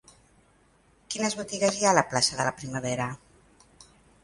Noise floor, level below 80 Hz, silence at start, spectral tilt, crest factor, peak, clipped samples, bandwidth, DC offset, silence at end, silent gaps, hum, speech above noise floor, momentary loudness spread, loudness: -62 dBFS; -62 dBFS; 1.1 s; -3 dB/octave; 26 dB; -4 dBFS; under 0.1%; 11.5 kHz; under 0.1%; 0.4 s; none; none; 36 dB; 12 LU; -26 LUFS